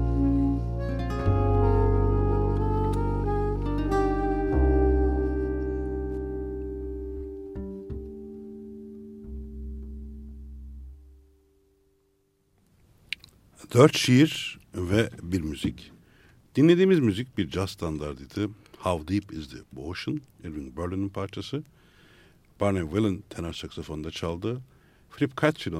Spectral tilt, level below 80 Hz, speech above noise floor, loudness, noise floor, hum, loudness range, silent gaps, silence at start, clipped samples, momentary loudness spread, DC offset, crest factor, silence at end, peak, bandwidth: -6.5 dB/octave; -34 dBFS; 43 dB; -27 LUFS; -69 dBFS; none; 17 LU; none; 0 s; under 0.1%; 20 LU; under 0.1%; 24 dB; 0 s; -4 dBFS; 15 kHz